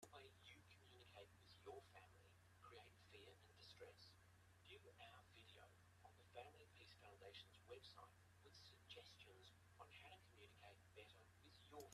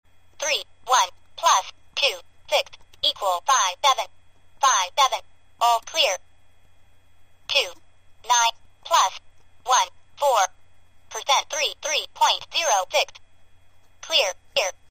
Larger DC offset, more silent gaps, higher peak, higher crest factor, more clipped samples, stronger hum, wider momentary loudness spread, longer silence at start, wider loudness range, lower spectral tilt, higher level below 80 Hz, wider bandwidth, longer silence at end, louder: second, under 0.1% vs 0.3%; neither; second, -46 dBFS vs -4 dBFS; about the same, 22 dB vs 20 dB; neither; neither; second, 6 LU vs 12 LU; second, 0 s vs 0.4 s; about the same, 2 LU vs 3 LU; first, -3.5 dB/octave vs 2.5 dB/octave; second, -86 dBFS vs -60 dBFS; second, 13.5 kHz vs 15.5 kHz; second, 0 s vs 0.2 s; second, -66 LUFS vs -22 LUFS